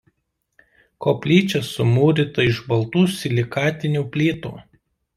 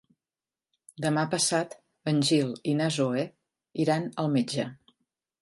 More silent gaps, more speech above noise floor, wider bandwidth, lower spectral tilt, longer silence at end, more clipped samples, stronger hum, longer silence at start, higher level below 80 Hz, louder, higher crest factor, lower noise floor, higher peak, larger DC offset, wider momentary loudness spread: neither; second, 54 dB vs over 63 dB; first, 14.5 kHz vs 11.5 kHz; first, -6.5 dB/octave vs -4.5 dB/octave; about the same, 0.55 s vs 0.65 s; neither; neither; about the same, 1 s vs 1 s; first, -54 dBFS vs -72 dBFS; first, -20 LUFS vs -28 LUFS; about the same, 18 dB vs 18 dB; second, -73 dBFS vs under -90 dBFS; first, -4 dBFS vs -12 dBFS; neither; second, 6 LU vs 12 LU